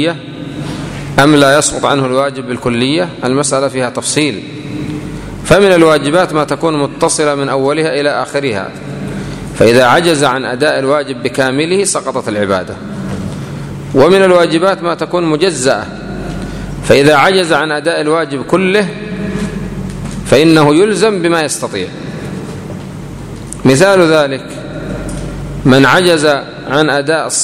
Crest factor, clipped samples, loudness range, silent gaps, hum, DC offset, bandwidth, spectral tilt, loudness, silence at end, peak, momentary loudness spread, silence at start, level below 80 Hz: 12 dB; 0.4%; 3 LU; none; none; under 0.1%; 16 kHz; -4.5 dB/octave; -11 LUFS; 0 s; 0 dBFS; 16 LU; 0 s; -36 dBFS